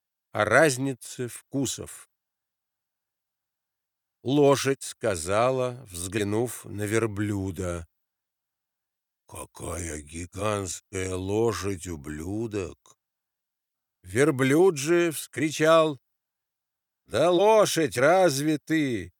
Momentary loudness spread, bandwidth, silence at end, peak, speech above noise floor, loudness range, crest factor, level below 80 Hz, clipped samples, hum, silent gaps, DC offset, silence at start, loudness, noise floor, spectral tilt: 16 LU; 19.5 kHz; 0.1 s; -4 dBFS; 61 dB; 11 LU; 22 dB; -56 dBFS; under 0.1%; none; none; under 0.1%; 0.35 s; -25 LUFS; -86 dBFS; -5 dB/octave